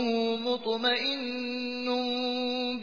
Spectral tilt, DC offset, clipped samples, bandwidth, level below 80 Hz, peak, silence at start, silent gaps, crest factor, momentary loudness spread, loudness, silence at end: -4 dB/octave; 0.2%; under 0.1%; 5.2 kHz; -74 dBFS; -14 dBFS; 0 s; none; 16 dB; 6 LU; -29 LUFS; 0 s